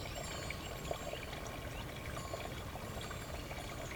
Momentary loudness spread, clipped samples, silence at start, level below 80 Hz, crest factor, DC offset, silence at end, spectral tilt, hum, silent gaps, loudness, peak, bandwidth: 2 LU; under 0.1%; 0 s; -52 dBFS; 18 dB; under 0.1%; 0 s; -4 dB/octave; none; none; -44 LUFS; -24 dBFS; over 20 kHz